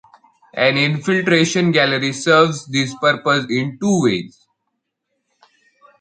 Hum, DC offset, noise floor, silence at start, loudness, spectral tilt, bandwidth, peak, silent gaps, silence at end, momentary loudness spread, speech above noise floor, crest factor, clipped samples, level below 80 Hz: none; under 0.1%; -75 dBFS; 0.55 s; -16 LUFS; -4.5 dB/octave; 9.4 kHz; 0 dBFS; none; 1.75 s; 7 LU; 58 dB; 18 dB; under 0.1%; -62 dBFS